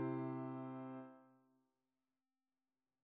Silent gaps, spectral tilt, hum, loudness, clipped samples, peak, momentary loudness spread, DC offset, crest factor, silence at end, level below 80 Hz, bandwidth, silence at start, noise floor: none; -9 dB/octave; none; -48 LUFS; under 0.1%; -34 dBFS; 16 LU; under 0.1%; 16 dB; 1.7 s; under -90 dBFS; 4.3 kHz; 0 s; under -90 dBFS